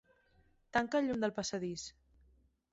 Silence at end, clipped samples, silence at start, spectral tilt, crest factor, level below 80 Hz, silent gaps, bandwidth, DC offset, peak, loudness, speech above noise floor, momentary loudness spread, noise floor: 0.85 s; under 0.1%; 0.75 s; -3.5 dB/octave; 20 dB; -68 dBFS; none; 8 kHz; under 0.1%; -18 dBFS; -36 LUFS; 35 dB; 11 LU; -70 dBFS